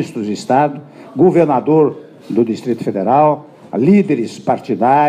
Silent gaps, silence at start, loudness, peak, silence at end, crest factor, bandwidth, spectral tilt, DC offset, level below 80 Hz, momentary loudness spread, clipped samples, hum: none; 0 s; -15 LUFS; 0 dBFS; 0 s; 14 dB; 10 kHz; -8 dB/octave; under 0.1%; -64 dBFS; 11 LU; under 0.1%; none